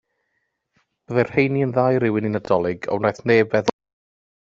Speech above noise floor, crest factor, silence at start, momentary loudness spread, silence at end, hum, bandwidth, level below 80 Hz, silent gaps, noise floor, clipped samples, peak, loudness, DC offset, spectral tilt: 54 dB; 20 dB; 1.1 s; 6 LU; 0.9 s; none; 7.6 kHz; -58 dBFS; none; -73 dBFS; under 0.1%; -2 dBFS; -20 LUFS; under 0.1%; -6 dB/octave